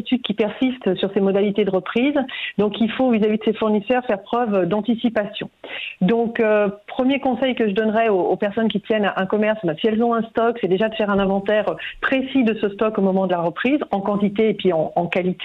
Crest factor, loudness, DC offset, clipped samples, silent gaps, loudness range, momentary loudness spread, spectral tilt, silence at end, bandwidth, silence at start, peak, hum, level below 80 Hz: 12 dB; -20 LUFS; under 0.1%; under 0.1%; none; 1 LU; 4 LU; -8.5 dB/octave; 0 s; 4.7 kHz; 0 s; -8 dBFS; none; -54 dBFS